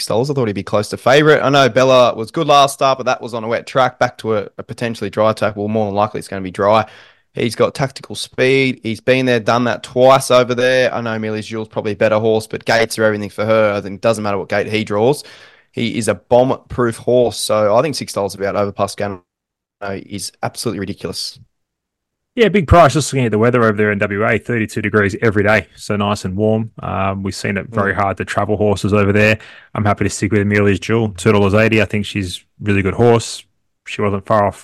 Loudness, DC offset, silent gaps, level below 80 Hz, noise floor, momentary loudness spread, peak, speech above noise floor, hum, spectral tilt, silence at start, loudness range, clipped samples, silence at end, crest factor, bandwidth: -16 LUFS; under 0.1%; none; -42 dBFS; -81 dBFS; 12 LU; 0 dBFS; 66 dB; none; -5.5 dB/octave; 0 s; 5 LU; under 0.1%; 0 s; 16 dB; 13 kHz